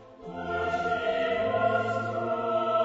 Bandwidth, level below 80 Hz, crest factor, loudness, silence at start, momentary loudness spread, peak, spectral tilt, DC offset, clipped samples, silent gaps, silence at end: 7.8 kHz; -58 dBFS; 16 dB; -28 LUFS; 0 s; 7 LU; -12 dBFS; -6 dB/octave; under 0.1%; under 0.1%; none; 0 s